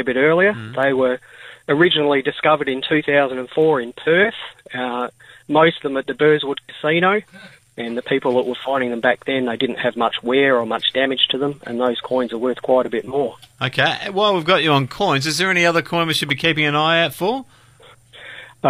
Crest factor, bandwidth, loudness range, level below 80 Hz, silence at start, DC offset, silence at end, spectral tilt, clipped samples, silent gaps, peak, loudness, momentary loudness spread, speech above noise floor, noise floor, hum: 16 dB; 15.5 kHz; 3 LU; -60 dBFS; 0 s; under 0.1%; 0 s; -4.5 dB/octave; under 0.1%; none; -2 dBFS; -18 LUFS; 10 LU; 30 dB; -48 dBFS; none